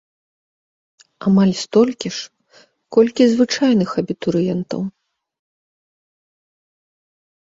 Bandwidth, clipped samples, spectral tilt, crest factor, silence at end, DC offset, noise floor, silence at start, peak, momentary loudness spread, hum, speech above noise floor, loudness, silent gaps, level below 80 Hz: 7.8 kHz; under 0.1%; -6 dB/octave; 18 dB; 2.7 s; under 0.1%; -53 dBFS; 1.2 s; -2 dBFS; 12 LU; none; 37 dB; -17 LUFS; none; -60 dBFS